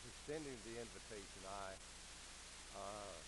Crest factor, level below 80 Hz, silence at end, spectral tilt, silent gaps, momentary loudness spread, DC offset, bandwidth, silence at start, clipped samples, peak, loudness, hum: 16 dB; -64 dBFS; 0 s; -3 dB/octave; none; 5 LU; under 0.1%; 11.5 kHz; 0 s; under 0.1%; -36 dBFS; -52 LUFS; none